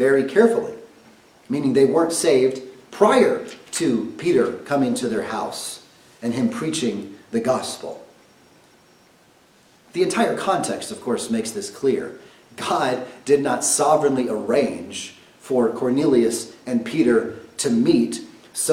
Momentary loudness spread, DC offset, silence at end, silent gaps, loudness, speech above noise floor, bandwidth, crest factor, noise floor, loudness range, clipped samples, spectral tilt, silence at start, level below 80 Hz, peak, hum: 15 LU; under 0.1%; 0 s; none; -21 LUFS; 34 dB; 16.5 kHz; 20 dB; -55 dBFS; 7 LU; under 0.1%; -4 dB/octave; 0 s; -62 dBFS; -2 dBFS; none